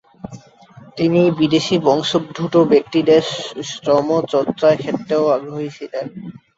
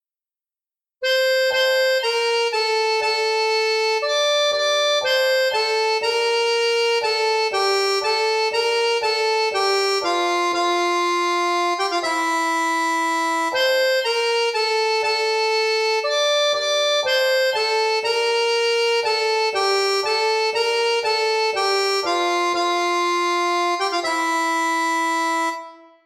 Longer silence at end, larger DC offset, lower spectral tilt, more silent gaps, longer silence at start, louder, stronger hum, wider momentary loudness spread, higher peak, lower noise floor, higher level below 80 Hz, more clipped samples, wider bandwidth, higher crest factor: about the same, 0.2 s vs 0.3 s; neither; first, -6 dB/octave vs 0 dB/octave; neither; second, 0.25 s vs 1 s; about the same, -17 LUFS vs -19 LUFS; neither; first, 14 LU vs 2 LU; first, -2 dBFS vs -8 dBFS; second, -44 dBFS vs under -90 dBFS; first, -58 dBFS vs -70 dBFS; neither; second, 8 kHz vs 15.5 kHz; about the same, 16 dB vs 12 dB